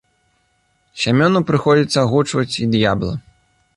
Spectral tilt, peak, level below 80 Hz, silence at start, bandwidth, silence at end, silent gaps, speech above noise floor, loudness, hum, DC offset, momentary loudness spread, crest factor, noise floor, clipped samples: -6 dB/octave; -2 dBFS; -46 dBFS; 0.95 s; 11.5 kHz; 0.55 s; none; 47 dB; -16 LUFS; none; under 0.1%; 8 LU; 16 dB; -63 dBFS; under 0.1%